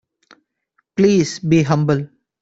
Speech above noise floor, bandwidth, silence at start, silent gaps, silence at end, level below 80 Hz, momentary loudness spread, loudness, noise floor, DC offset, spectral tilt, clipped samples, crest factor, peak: 52 dB; 8 kHz; 0.95 s; none; 0.35 s; -54 dBFS; 11 LU; -17 LUFS; -67 dBFS; under 0.1%; -6.5 dB/octave; under 0.1%; 16 dB; -2 dBFS